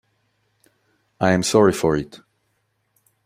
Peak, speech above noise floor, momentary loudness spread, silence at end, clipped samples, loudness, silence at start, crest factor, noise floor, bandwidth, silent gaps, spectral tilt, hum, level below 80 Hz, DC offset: -2 dBFS; 52 dB; 10 LU; 1.1 s; under 0.1%; -19 LUFS; 1.2 s; 20 dB; -70 dBFS; 16 kHz; none; -5 dB/octave; none; -52 dBFS; under 0.1%